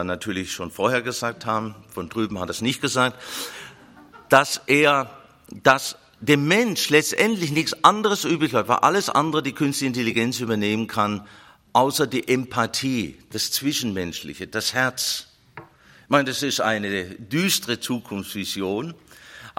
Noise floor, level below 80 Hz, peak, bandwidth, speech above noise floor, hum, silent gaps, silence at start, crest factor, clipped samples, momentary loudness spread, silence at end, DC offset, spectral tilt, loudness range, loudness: -49 dBFS; -62 dBFS; 0 dBFS; 16.5 kHz; 26 dB; none; none; 0 s; 24 dB; under 0.1%; 13 LU; 0.1 s; under 0.1%; -3.5 dB/octave; 6 LU; -22 LUFS